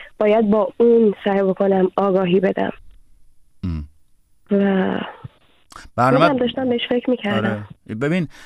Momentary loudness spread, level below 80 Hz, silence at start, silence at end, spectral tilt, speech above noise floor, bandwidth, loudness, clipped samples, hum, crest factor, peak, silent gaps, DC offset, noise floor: 13 LU; -46 dBFS; 0 s; 0 s; -8 dB/octave; 39 dB; 10 kHz; -18 LUFS; under 0.1%; none; 18 dB; -2 dBFS; none; under 0.1%; -56 dBFS